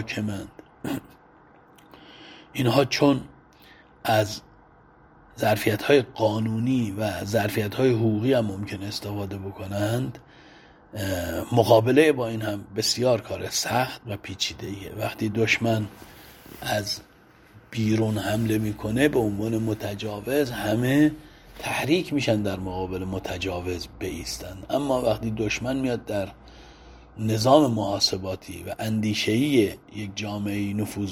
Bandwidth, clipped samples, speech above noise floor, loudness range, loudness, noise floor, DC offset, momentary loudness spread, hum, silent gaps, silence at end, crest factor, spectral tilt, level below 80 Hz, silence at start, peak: 19 kHz; under 0.1%; 29 dB; 5 LU; -25 LUFS; -54 dBFS; under 0.1%; 14 LU; none; none; 0 s; 22 dB; -5.5 dB/octave; -52 dBFS; 0 s; -2 dBFS